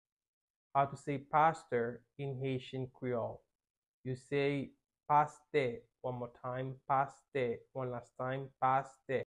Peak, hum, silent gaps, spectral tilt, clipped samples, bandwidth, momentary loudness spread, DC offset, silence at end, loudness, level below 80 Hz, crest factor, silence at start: -16 dBFS; none; 3.55-3.59 s, 3.70-3.82 s, 3.88-4.04 s; -7 dB/octave; under 0.1%; 10.5 kHz; 12 LU; under 0.1%; 0 s; -37 LUFS; -72 dBFS; 20 dB; 0.75 s